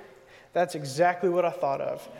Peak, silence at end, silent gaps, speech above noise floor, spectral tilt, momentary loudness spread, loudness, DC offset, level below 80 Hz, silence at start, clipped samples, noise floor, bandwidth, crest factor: -12 dBFS; 0 s; none; 26 dB; -5.5 dB/octave; 7 LU; -27 LUFS; under 0.1%; -72 dBFS; 0 s; under 0.1%; -52 dBFS; 16 kHz; 16 dB